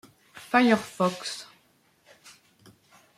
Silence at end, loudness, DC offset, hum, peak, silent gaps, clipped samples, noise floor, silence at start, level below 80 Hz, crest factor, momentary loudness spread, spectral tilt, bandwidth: 1.75 s; -25 LUFS; under 0.1%; none; -8 dBFS; none; under 0.1%; -64 dBFS; 0.35 s; -72 dBFS; 22 dB; 18 LU; -4.5 dB/octave; 15 kHz